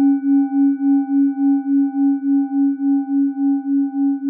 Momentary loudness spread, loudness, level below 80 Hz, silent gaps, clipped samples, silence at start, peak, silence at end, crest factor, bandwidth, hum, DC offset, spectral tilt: 3 LU; -17 LUFS; under -90 dBFS; none; under 0.1%; 0 s; -8 dBFS; 0 s; 8 dB; 1.6 kHz; none; under 0.1%; -13.5 dB/octave